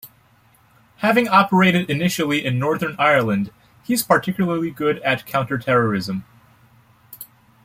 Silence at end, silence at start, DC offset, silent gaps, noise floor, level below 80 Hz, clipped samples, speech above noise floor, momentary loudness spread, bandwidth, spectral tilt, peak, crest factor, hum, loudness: 0.4 s; 0.05 s; under 0.1%; none; -55 dBFS; -58 dBFS; under 0.1%; 37 dB; 15 LU; 16.5 kHz; -5.5 dB/octave; -2 dBFS; 18 dB; none; -19 LUFS